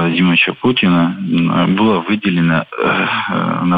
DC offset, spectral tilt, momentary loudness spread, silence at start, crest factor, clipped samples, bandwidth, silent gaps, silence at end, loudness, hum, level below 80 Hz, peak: under 0.1%; -9 dB/octave; 4 LU; 0 s; 12 dB; under 0.1%; 4.9 kHz; none; 0 s; -14 LUFS; none; -50 dBFS; -2 dBFS